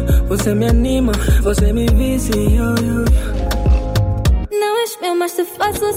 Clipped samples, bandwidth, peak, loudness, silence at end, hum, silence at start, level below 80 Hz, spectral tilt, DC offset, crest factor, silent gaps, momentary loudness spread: under 0.1%; 16.5 kHz; -4 dBFS; -16 LUFS; 0 s; none; 0 s; -18 dBFS; -6 dB/octave; under 0.1%; 12 dB; none; 4 LU